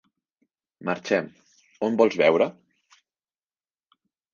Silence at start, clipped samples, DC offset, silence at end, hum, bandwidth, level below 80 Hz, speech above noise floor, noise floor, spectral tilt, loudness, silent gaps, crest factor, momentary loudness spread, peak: 0.8 s; under 0.1%; under 0.1%; 1.85 s; none; 7.2 kHz; -72 dBFS; over 68 dB; under -90 dBFS; -5.5 dB/octave; -23 LUFS; none; 22 dB; 13 LU; -4 dBFS